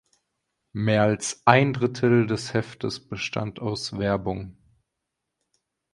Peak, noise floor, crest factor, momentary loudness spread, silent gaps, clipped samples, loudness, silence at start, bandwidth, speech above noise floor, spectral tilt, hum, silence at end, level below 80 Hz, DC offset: 0 dBFS; -82 dBFS; 26 dB; 13 LU; none; under 0.1%; -24 LUFS; 0.75 s; 11.5 kHz; 59 dB; -5.5 dB/octave; none; 1.45 s; -54 dBFS; under 0.1%